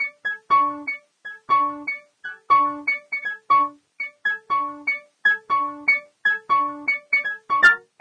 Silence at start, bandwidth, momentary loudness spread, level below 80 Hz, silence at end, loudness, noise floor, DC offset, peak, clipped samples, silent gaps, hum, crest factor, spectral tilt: 0 s; 9.6 kHz; 13 LU; -70 dBFS; 0.2 s; -21 LUFS; -41 dBFS; under 0.1%; -4 dBFS; under 0.1%; none; none; 18 dB; -2.5 dB/octave